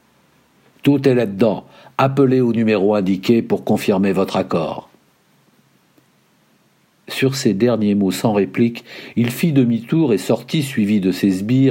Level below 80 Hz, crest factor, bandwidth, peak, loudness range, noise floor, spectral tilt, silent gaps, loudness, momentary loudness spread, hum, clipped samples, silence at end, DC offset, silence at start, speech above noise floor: -62 dBFS; 16 dB; 16.5 kHz; -2 dBFS; 7 LU; -58 dBFS; -6.5 dB/octave; none; -17 LUFS; 6 LU; none; under 0.1%; 0 s; under 0.1%; 0.85 s; 41 dB